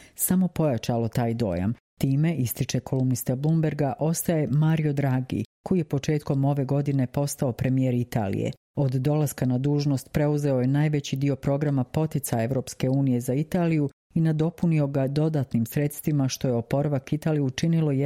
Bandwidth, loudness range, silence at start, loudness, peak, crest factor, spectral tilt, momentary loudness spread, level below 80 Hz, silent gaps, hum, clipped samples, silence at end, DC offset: 16.5 kHz; 1 LU; 0.2 s; -25 LUFS; -10 dBFS; 14 dB; -7 dB/octave; 4 LU; -54 dBFS; 1.80-1.97 s, 5.46-5.64 s, 8.57-8.74 s, 13.93-14.10 s; none; under 0.1%; 0 s; under 0.1%